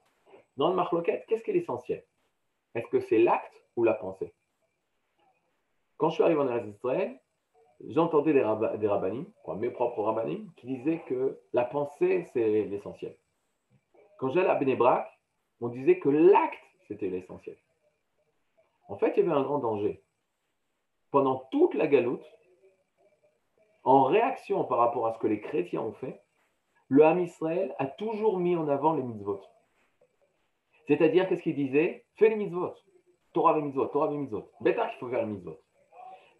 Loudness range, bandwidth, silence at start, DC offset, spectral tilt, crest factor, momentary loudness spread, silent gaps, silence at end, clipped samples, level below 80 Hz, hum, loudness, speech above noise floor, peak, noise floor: 4 LU; 6 kHz; 0.55 s; under 0.1%; -8.5 dB/octave; 20 dB; 15 LU; none; 0.25 s; under 0.1%; -78 dBFS; none; -28 LUFS; 54 dB; -8 dBFS; -81 dBFS